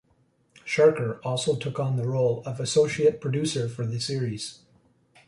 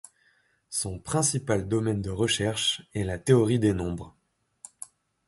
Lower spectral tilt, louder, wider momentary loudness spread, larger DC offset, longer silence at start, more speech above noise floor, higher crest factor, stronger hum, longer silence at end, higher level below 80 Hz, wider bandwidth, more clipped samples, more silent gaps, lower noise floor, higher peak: about the same, -5.5 dB/octave vs -4.5 dB/octave; about the same, -26 LUFS vs -26 LUFS; second, 9 LU vs 20 LU; neither; about the same, 0.65 s vs 0.7 s; about the same, 41 dB vs 41 dB; about the same, 18 dB vs 20 dB; neither; second, 0.75 s vs 1.2 s; second, -62 dBFS vs -48 dBFS; about the same, 11.5 kHz vs 12 kHz; neither; neither; about the same, -66 dBFS vs -67 dBFS; about the same, -8 dBFS vs -8 dBFS